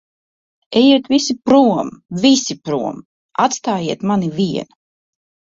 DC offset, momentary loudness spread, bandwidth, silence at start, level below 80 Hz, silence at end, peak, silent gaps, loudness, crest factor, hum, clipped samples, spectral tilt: under 0.1%; 13 LU; 7.8 kHz; 0.7 s; -58 dBFS; 0.85 s; -2 dBFS; 3.05-3.29 s; -16 LUFS; 16 dB; none; under 0.1%; -4.5 dB/octave